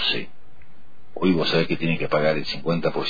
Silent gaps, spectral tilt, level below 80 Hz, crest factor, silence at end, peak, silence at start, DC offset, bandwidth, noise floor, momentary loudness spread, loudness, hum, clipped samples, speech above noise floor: none; -6.5 dB/octave; -50 dBFS; 16 dB; 0 s; -8 dBFS; 0 s; 4%; 5 kHz; -52 dBFS; 8 LU; -23 LUFS; none; under 0.1%; 30 dB